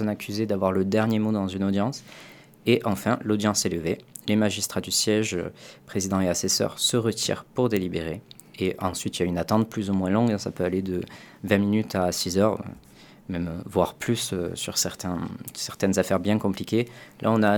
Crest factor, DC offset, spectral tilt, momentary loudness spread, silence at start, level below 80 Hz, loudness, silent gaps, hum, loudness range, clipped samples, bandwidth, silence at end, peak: 22 dB; under 0.1%; -4.5 dB/octave; 10 LU; 0 s; -56 dBFS; -25 LUFS; none; none; 2 LU; under 0.1%; 19 kHz; 0 s; -4 dBFS